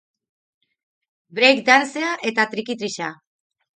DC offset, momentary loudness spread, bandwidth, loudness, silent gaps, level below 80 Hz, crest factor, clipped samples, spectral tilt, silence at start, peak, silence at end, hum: under 0.1%; 14 LU; 9.4 kHz; -18 LUFS; none; -74 dBFS; 22 dB; under 0.1%; -2.5 dB/octave; 1.35 s; -2 dBFS; 0.65 s; none